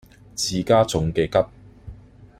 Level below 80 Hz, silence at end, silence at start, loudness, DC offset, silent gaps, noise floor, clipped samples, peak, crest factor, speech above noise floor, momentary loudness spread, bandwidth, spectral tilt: -44 dBFS; 0.15 s; 0.35 s; -21 LUFS; under 0.1%; none; -44 dBFS; under 0.1%; -6 dBFS; 18 dB; 24 dB; 10 LU; 15.5 kHz; -5 dB/octave